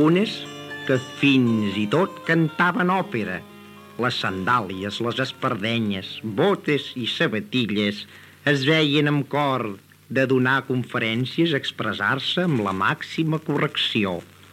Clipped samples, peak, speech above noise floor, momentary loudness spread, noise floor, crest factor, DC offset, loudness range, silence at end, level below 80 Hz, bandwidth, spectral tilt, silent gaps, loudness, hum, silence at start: under 0.1%; -6 dBFS; 21 dB; 9 LU; -44 dBFS; 16 dB; under 0.1%; 2 LU; 0.3 s; -68 dBFS; 16 kHz; -6 dB/octave; none; -22 LUFS; none; 0 s